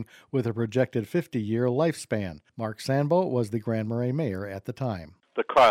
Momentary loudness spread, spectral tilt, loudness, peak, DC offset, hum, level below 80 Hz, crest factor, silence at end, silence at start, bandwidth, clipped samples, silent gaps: 11 LU; -7 dB/octave; -28 LUFS; -10 dBFS; under 0.1%; none; -62 dBFS; 16 dB; 0 s; 0 s; 15.5 kHz; under 0.1%; none